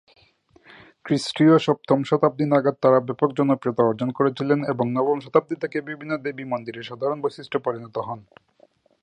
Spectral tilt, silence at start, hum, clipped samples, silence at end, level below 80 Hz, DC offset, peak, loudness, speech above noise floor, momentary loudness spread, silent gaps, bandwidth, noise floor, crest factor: -7 dB/octave; 1.05 s; none; under 0.1%; 0.8 s; -68 dBFS; under 0.1%; -2 dBFS; -22 LUFS; 37 dB; 11 LU; none; 11 kHz; -59 dBFS; 22 dB